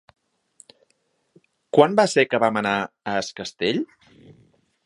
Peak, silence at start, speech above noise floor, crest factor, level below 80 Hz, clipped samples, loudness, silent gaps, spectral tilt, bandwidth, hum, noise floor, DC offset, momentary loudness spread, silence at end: -2 dBFS; 1.75 s; 48 dB; 22 dB; -66 dBFS; under 0.1%; -21 LUFS; none; -4.5 dB/octave; 11.5 kHz; none; -69 dBFS; under 0.1%; 11 LU; 1 s